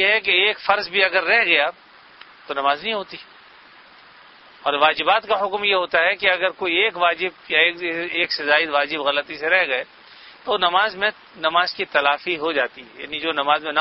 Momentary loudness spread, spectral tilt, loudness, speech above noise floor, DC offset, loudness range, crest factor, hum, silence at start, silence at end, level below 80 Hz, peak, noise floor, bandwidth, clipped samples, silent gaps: 9 LU; -5 dB/octave; -19 LUFS; 27 dB; under 0.1%; 4 LU; 20 dB; none; 0 s; 0 s; -62 dBFS; -2 dBFS; -47 dBFS; 6 kHz; under 0.1%; none